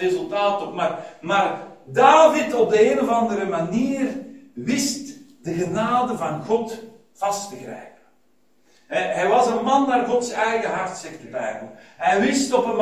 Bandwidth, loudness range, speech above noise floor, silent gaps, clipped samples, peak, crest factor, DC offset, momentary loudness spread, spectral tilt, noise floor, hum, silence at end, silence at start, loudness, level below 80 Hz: 16 kHz; 7 LU; 44 dB; none; under 0.1%; 0 dBFS; 20 dB; 0.1%; 17 LU; -4.5 dB/octave; -65 dBFS; none; 0 s; 0 s; -21 LUFS; -62 dBFS